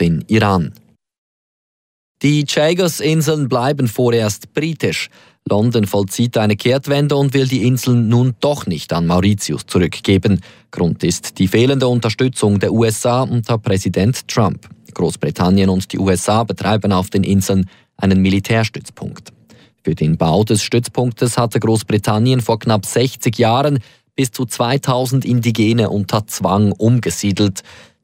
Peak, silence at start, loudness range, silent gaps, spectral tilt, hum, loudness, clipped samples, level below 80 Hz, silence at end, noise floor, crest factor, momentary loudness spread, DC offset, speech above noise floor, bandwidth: -2 dBFS; 0 s; 2 LU; 1.18-2.15 s; -6 dB/octave; none; -16 LUFS; under 0.1%; -46 dBFS; 0.3 s; under -90 dBFS; 14 dB; 6 LU; under 0.1%; over 75 dB; 16.5 kHz